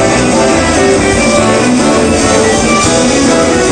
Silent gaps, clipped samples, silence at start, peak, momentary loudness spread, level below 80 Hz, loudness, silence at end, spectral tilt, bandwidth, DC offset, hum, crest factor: none; 0.1%; 0 s; 0 dBFS; 1 LU; -26 dBFS; -8 LUFS; 0 s; -4 dB/octave; 9.8 kHz; 0.5%; none; 8 dB